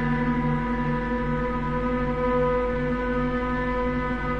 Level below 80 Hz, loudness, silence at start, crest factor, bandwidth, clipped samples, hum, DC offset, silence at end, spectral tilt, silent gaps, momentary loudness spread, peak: -34 dBFS; -25 LUFS; 0 s; 12 dB; 6.6 kHz; under 0.1%; none; under 0.1%; 0 s; -8.5 dB/octave; none; 3 LU; -12 dBFS